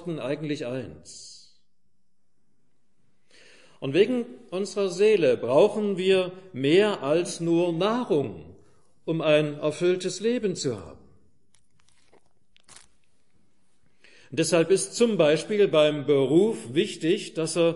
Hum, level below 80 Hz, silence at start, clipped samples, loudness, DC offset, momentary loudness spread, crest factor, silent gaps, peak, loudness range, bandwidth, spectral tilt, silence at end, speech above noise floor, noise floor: none; -66 dBFS; 0 s; under 0.1%; -24 LUFS; 0.2%; 14 LU; 18 dB; none; -8 dBFS; 13 LU; 11.5 kHz; -5 dB/octave; 0 s; 54 dB; -78 dBFS